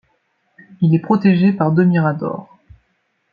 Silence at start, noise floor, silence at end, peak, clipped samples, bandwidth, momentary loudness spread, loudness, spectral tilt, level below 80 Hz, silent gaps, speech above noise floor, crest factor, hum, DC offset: 0.8 s; -66 dBFS; 0.9 s; -2 dBFS; under 0.1%; 5 kHz; 11 LU; -16 LUFS; -10.5 dB/octave; -58 dBFS; none; 52 dB; 16 dB; none; under 0.1%